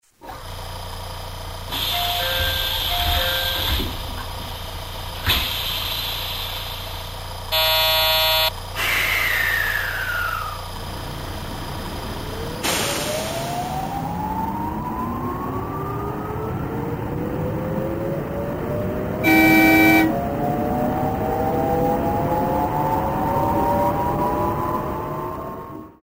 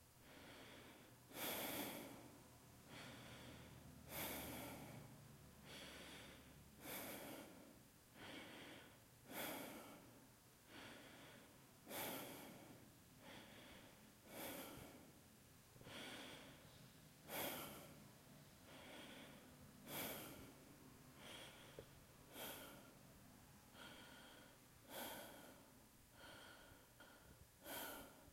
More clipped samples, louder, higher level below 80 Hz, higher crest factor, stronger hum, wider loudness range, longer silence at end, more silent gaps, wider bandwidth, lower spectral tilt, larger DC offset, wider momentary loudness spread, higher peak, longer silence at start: neither; first, -21 LUFS vs -56 LUFS; first, -36 dBFS vs -78 dBFS; about the same, 20 dB vs 24 dB; neither; about the same, 8 LU vs 6 LU; about the same, 0.1 s vs 0 s; neither; about the same, 16.5 kHz vs 16.5 kHz; about the same, -4 dB/octave vs -3 dB/octave; neither; about the same, 15 LU vs 16 LU; first, -2 dBFS vs -34 dBFS; first, 0.2 s vs 0 s